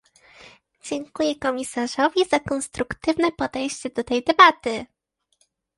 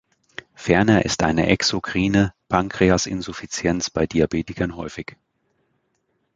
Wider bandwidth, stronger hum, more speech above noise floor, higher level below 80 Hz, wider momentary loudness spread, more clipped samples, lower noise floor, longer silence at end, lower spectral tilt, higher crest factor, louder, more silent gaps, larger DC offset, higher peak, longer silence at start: first, 11.5 kHz vs 9.4 kHz; neither; second, 46 dB vs 50 dB; second, -54 dBFS vs -42 dBFS; about the same, 16 LU vs 14 LU; neither; about the same, -68 dBFS vs -70 dBFS; second, 0.9 s vs 1.35 s; second, -3 dB/octave vs -5 dB/octave; about the same, 22 dB vs 20 dB; about the same, -22 LUFS vs -21 LUFS; neither; neither; about the same, 0 dBFS vs -2 dBFS; first, 0.85 s vs 0.6 s